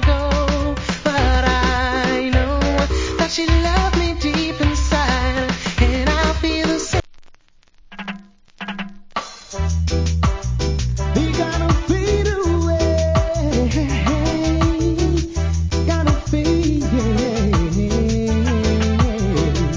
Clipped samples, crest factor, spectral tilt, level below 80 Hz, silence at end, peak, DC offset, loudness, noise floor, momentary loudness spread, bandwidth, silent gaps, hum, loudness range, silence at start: under 0.1%; 16 dB; -5.5 dB/octave; -22 dBFS; 0 s; -2 dBFS; under 0.1%; -19 LUFS; -49 dBFS; 5 LU; 7.6 kHz; none; none; 5 LU; 0 s